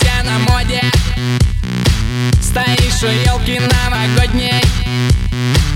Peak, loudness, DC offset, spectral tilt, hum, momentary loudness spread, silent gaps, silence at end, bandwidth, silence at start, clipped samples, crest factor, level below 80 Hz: 0 dBFS; -14 LUFS; under 0.1%; -4.5 dB/octave; none; 2 LU; none; 0 s; 16.5 kHz; 0 s; under 0.1%; 12 dB; -18 dBFS